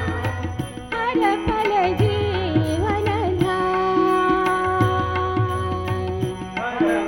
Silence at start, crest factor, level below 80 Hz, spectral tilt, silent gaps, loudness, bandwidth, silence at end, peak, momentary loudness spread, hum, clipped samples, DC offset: 0 s; 16 dB; -42 dBFS; -7 dB/octave; none; -21 LUFS; 16.5 kHz; 0 s; -6 dBFS; 8 LU; none; under 0.1%; under 0.1%